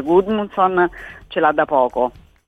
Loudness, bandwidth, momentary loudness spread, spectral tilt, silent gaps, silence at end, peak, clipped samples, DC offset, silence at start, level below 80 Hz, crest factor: -18 LUFS; 6.2 kHz; 8 LU; -7.5 dB/octave; none; 0.35 s; -2 dBFS; under 0.1%; under 0.1%; 0 s; -48 dBFS; 16 dB